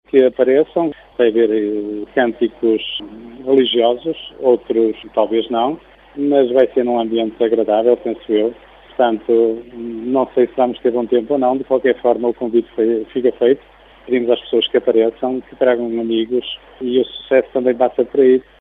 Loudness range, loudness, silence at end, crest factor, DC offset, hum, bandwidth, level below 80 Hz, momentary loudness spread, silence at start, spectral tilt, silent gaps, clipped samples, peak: 1 LU; -17 LUFS; 0.2 s; 16 dB; under 0.1%; none; 4 kHz; -54 dBFS; 8 LU; 0.15 s; -8 dB/octave; none; under 0.1%; 0 dBFS